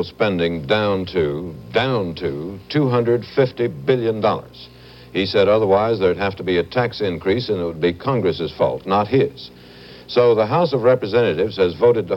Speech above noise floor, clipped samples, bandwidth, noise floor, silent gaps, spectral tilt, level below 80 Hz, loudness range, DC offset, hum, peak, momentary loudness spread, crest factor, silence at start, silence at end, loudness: 22 dB; under 0.1%; 17 kHz; -41 dBFS; none; -8 dB/octave; -50 dBFS; 2 LU; under 0.1%; none; -2 dBFS; 8 LU; 16 dB; 0 s; 0 s; -19 LUFS